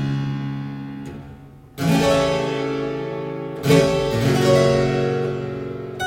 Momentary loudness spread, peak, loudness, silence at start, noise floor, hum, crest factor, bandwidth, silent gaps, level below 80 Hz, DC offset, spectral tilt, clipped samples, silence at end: 16 LU; -2 dBFS; -20 LUFS; 0 s; -41 dBFS; none; 18 dB; 16.5 kHz; none; -44 dBFS; under 0.1%; -6 dB/octave; under 0.1%; 0 s